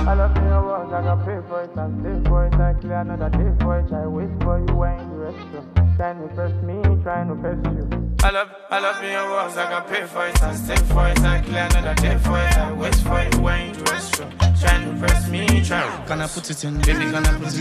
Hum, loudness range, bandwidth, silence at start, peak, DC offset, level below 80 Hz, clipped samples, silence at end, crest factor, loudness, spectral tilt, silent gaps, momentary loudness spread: none; 3 LU; 15.5 kHz; 0 s; -2 dBFS; under 0.1%; -22 dBFS; under 0.1%; 0 s; 18 dB; -21 LUFS; -5.5 dB/octave; none; 7 LU